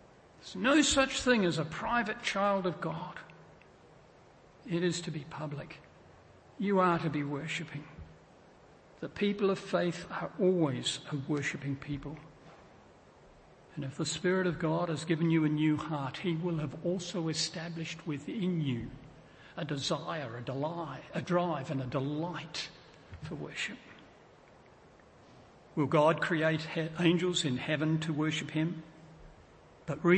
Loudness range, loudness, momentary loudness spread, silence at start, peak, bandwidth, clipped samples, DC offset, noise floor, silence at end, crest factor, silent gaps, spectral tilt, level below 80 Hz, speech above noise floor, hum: 9 LU; -32 LUFS; 16 LU; 0.4 s; -12 dBFS; 8.8 kHz; under 0.1%; under 0.1%; -59 dBFS; 0 s; 22 dB; none; -5 dB/octave; -62 dBFS; 27 dB; none